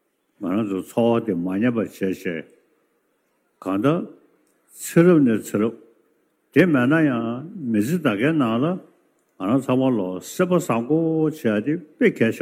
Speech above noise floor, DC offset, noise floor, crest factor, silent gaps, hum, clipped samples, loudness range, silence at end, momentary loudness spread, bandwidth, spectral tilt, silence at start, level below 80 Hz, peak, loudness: 48 dB; under 0.1%; -68 dBFS; 18 dB; none; none; under 0.1%; 5 LU; 0 s; 11 LU; 16 kHz; -7 dB/octave; 0.4 s; -72 dBFS; -4 dBFS; -21 LUFS